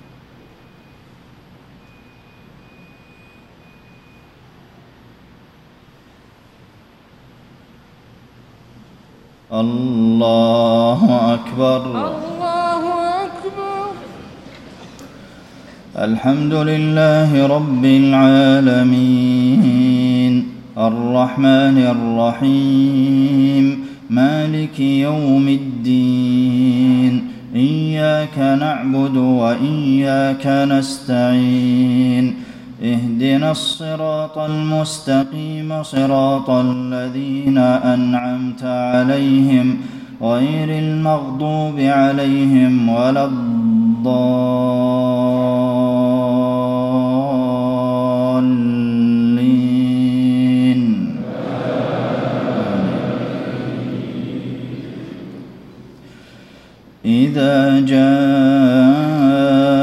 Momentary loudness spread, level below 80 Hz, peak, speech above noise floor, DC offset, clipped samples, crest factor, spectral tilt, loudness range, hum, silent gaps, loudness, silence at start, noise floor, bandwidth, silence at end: 11 LU; -54 dBFS; 0 dBFS; 33 dB; under 0.1%; under 0.1%; 14 dB; -7.5 dB/octave; 9 LU; none; none; -15 LUFS; 9.5 s; -47 dBFS; 11.5 kHz; 0 s